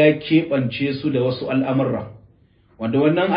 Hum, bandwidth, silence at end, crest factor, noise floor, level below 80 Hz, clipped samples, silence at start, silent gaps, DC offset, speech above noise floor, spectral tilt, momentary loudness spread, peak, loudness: none; 5.2 kHz; 0 s; 16 dB; -55 dBFS; -56 dBFS; under 0.1%; 0 s; none; under 0.1%; 36 dB; -12 dB/octave; 9 LU; -4 dBFS; -20 LUFS